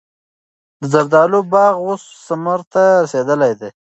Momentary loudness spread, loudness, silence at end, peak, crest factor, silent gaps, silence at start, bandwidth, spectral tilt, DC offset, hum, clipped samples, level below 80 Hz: 11 LU; -14 LUFS; 0.1 s; 0 dBFS; 14 dB; 2.67-2.71 s; 0.8 s; 8.2 kHz; -6.5 dB/octave; under 0.1%; none; under 0.1%; -66 dBFS